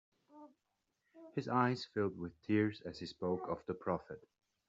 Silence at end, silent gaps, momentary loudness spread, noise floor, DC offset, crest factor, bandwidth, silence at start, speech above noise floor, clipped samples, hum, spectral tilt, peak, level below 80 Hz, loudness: 0.5 s; none; 13 LU; -85 dBFS; under 0.1%; 22 dB; 7.6 kHz; 0.35 s; 47 dB; under 0.1%; none; -5.5 dB/octave; -18 dBFS; -74 dBFS; -39 LUFS